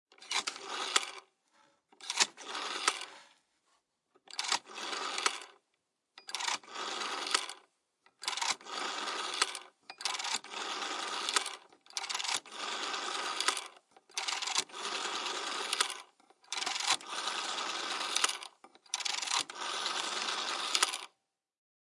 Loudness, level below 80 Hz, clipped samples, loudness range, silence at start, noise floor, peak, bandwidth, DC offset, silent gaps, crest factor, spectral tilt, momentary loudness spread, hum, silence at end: -34 LUFS; under -90 dBFS; under 0.1%; 3 LU; 0.2 s; -82 dBFS; -6 dBFS; 11.5 kHz; under 0.1%; none; 32 dB; 2 dB/octave; 11 LU; none; 0.9 s